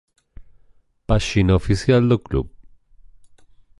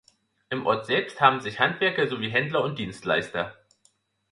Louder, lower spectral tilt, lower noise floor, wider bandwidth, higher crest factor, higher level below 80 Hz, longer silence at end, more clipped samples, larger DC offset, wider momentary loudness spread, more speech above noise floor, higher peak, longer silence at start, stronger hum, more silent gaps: first, -19 LUFS vs -25 LUFS; first, -7 dB/octave vs -5.5 dB/octave; second, -54 dBFS vs -67 dBFS; about the same, 11.5 kHz vs 11.5 kHz; second, 18 dB vs 24 dB; first, -32 dBFS vs -62 dBFS; first, 1.3 s vs 0.8 s; neither; neither; about the same, 12 LU vs 11 LU; second, 37 dB vs 41 dB; about the same, -4 dBFS vs -2 dBFS; about the same, 0.4 s vs 0.5 s; neither; neither